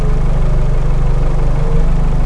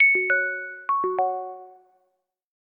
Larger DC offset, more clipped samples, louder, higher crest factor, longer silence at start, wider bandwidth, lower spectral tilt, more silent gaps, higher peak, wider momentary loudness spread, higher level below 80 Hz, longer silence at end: neither; neither; first, -17 LUFS vs -23 LUFS; second, 8 dB vs 16 dB; about the same, 0 s vs 0 s; first, 4.5 kHz vs 3.8 kHz; about the same, -8 dB/octave vs -7.5 dB/octave; neither; first, -2 dBFS vs -10 dBFS; second, 1 LU vs 16 LU; first, -12 dBFS vs -84 dBFS; second, 0 s vs 0.95 s